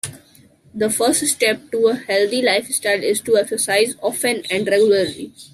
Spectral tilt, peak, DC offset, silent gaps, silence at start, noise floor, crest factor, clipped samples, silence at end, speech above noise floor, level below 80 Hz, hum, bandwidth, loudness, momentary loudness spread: -2 dB/octave; -4 dBFS; under 0.1%; none; 0.05 s; -50 dBFS; 16 dB; under 0.1%; 0.05 s; 32 dB; -64 dBFS; none; 15.5 kHz; -18 LUFS; 5 LU